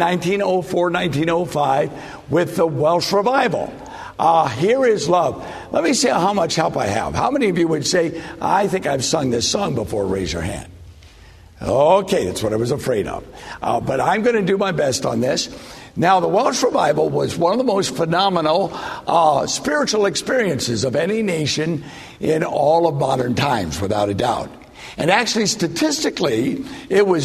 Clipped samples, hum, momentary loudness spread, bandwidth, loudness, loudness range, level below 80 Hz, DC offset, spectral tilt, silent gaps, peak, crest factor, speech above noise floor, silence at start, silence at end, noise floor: under 0.1%; none; 9 LU; 13.5 kHz; -18 LUFS; 3 LU; -46 dBFS; under 0.1%; -4.5 dB/octave; none; -2 dBFS; 16 dB; 25 dB; 0 s; 0 s; -44 dBFS